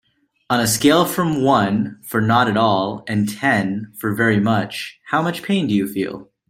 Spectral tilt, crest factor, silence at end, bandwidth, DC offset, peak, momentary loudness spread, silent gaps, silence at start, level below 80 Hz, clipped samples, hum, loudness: -5 dB/octave; 18 dB; 0.25 s; 16.5 kHz; under 0.1%; -2 dBFS; 10 LU; none; 0.5 s; -56 dBFS; under 0.1%; none; -18 LUFS